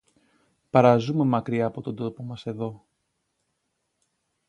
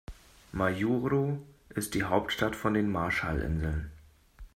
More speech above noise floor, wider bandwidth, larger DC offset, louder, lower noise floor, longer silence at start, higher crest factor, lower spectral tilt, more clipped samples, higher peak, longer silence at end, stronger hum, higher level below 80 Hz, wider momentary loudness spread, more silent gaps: first, 53 dB vs 22 dB; second, 9.6 kHz vs 16 kHz; neither; first, -24 LUFS vs -31 LUFS; first, -77 dBFS vs -51 dBFS; first, 0.75 s vs 0.1 s; about the same, 24 dB vs 20 dB; first, -8.5 dB/octave vs -6 dB/octave; neither; first, -2 dBFS vs -10 dBFS; first, 1.7 s vs 0.1 s; neither; second, -64 dBFS vs -44 dBFS; first, 16 LU vs 11 LU; neither